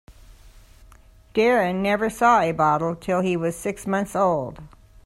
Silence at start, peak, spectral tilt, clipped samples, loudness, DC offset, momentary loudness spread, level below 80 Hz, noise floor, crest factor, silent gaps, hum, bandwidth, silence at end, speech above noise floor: 0.1 s; -6 dBFS; -6 dB/octave; under 0.1%; -22 LUFS; under 0.1%; 9 LU; -50 dBFS; -50 dBFS; 18 dB; none; none; 14 kHz; 0.4 s; 29 dB